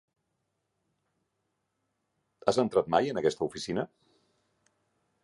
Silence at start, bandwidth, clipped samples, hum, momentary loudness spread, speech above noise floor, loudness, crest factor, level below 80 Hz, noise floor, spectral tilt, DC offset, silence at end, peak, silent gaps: 2.45 s; 11.5 kHz; under 0.1%; none; 8 LU; 52 dB; -29 LUFS; 26 dB; -68 dBFS; -80 dBFS; -5 dB/octave; under 0.1%; 1.4 s; -8 dBFS; none